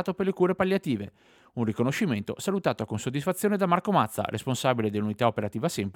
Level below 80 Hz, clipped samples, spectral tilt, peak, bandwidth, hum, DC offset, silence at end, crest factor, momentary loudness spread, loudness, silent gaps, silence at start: -66 dBFS; under 0.1%; -6 dB/octave; -8 dBFS; 18.5 kHz; none; under 0.1%; 0.05 s; 20 dB; 7 LU; -27 LUFS; none; 0 s